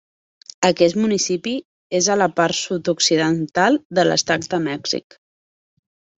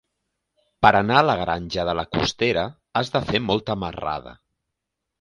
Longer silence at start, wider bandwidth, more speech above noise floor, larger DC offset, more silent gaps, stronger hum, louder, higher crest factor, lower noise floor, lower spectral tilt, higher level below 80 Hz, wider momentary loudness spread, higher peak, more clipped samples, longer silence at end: second, 0.6 s vs 0.8 s; second, 8.2 kHz vs 11.5 kHz; first, over 71 dB vs 60 dB; neither; first, 1.65-1.90 s, 3.85-3.90 s vs none; neither; first, -19 LUFS vs -22 LUFS; about the same, 18 dB vs 22 dB; first, under -90 dBFS vs -82 dBFS; second, -3.5 dB/octave vs -5 dB/octave; second, -62 dBFS vs -46 dBFS; second, 8 LU vs 11 LU; about the same, -2 dBFS vs 0 dBFS; neither; first, 1.2 s vs 0.85 s